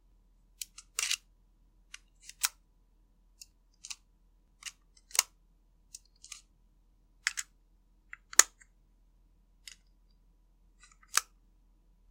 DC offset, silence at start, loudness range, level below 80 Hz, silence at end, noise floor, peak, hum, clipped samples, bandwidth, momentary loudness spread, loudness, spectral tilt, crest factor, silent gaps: under 0.1%; 0.6 s; 9 LU; -66 dBFS; 0.9 s; -66 dBFS; 0 dBFS; none; under 0.1%; 16.5 kHz; 27 LU; -31 LUFS; 3 dB/octave; 40 dB; none